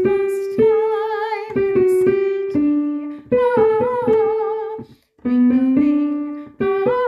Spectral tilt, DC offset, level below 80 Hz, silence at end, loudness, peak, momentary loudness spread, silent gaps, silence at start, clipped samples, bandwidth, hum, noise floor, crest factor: -7.5 dB/octave; under 0.1%; -52 dBFS; 0 s; -18 LUFS; -4 dBFS; 10 LU; none; 0 s; under 0.1%; 12.5 kHz; none; -37 dBFS; 12 dB